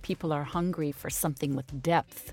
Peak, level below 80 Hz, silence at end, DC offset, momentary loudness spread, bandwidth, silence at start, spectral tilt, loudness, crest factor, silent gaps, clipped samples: -14 dBFS; -54 dBFS; 0 s; under 0.1%; 5 LU; 17 kHz; 0 s; -5.5 dB/octave; -31 LUFS; 18 dB; none; under 0.1%